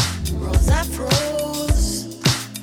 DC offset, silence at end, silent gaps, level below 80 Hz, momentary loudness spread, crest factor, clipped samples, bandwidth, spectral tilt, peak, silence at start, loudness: under 0.1%; 0 s; none; -24 dBFS; 5 LU; 16 dB; under 0.1%; 18 kHz; -4 dB/octave; -4 dBFS; 0 s; -21 LUFS